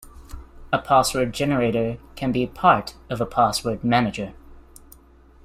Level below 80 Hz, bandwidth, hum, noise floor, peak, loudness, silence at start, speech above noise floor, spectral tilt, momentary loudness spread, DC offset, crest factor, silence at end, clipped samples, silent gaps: -44 dBFS; 15.5 kHz; none; -51 dBFS; -2 dBFS; -22 LUFS; 0 s; 29 dB; -5 dB/octave; 11 LU; under 0.1%; 20 dB; 0.85 s; under 0.1%; none